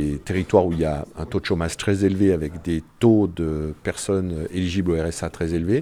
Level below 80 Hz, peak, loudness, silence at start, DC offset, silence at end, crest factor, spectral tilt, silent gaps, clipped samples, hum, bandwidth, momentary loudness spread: -38 dBFS; -2 dBFS; -23 LUFS; 0 s; under 0.1%; 0 s; 20 dB; -6.5 dB/octave; none; under 0.1%; none; 13.5 kHz; 9 LU